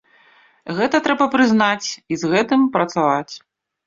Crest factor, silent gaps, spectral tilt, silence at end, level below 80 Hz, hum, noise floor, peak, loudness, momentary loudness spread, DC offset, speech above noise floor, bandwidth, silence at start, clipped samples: 16 dB; none; -4.5 dB/octave; 0.5 s; -60 dBFS; none; -53 dBFS; -2 dBFS; -18 LUFS; 13 LU; under 0.1%; 36 dB; 7.6 kHz; 0.65 s; under 0.1%